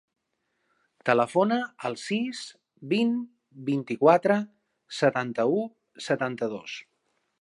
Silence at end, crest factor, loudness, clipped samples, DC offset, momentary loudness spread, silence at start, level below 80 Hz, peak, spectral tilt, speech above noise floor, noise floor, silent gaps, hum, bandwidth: 0.6 s; 22 dB; -26 LUFS; under 0.1%; under 0.1%; 17 LU; 1.05 s; -78 dBFS; -6 dBFS; -5.5 dB/octave; 52 dB; -77 dBFS; none; none; 11.5 kHz